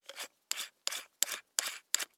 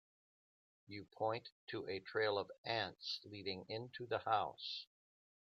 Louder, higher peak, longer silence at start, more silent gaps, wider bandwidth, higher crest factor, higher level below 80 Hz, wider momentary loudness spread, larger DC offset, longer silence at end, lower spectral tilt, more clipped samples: first, -36 LUFS vs -43 LUFS; first, -6 dBFS vs -22 dBFS; second, 0.1 s vs 0.9 s; second, none vs 1.52-1.67 s, 2.58-2.64 s; first, 19 kHz vs 7.6 kHz; first, 34 dB vs 22 dB; second, under -90 dBFS vs -84 dBFS; second, 7 LU vs 11 LU; neither; second, 0.1 s vs 0.75 s; second, 4 dB/octave vs -5 dB/octave; neither